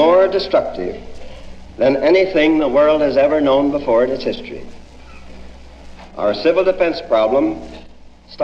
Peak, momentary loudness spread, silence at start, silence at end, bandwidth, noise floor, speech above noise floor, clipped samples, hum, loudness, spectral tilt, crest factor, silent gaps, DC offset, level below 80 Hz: -2 dBFS; 17 LU; 0 s; 0 s; 7.4 kHz; -39 dBFS; 24 dB; under 0.1%; none; -15 LUFS; -6.5 dB/octave; 14 dB; none; under 0.1%; -40 dBFS